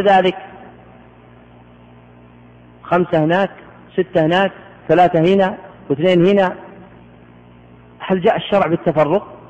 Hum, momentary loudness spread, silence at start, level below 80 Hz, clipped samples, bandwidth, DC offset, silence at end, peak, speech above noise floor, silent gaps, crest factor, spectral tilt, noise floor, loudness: 60 Hz at -45 dBFS; 15 LU; 0 s; -52 dBFS; under 0.1%; 8.2 kHz; under 0.1%; 0.15 s; -4 dBFS; 29 dB; none; 14 dB; -8 dB/octave; -44 dBFS; -16 LUFS